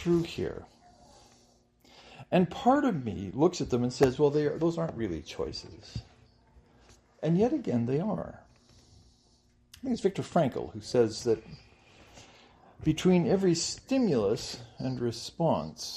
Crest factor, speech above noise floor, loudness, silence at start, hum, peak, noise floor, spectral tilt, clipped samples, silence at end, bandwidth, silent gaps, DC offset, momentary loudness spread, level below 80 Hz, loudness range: 22 dB; 36 dB; -29 LUFS; 0 s; none; -8 dBFS; -65 dBFS; -6 dB/octave; under 0.1%; 0 s; 13 kHz; none; under 0.1%; 12 LU; -56 dBFS; 5 LU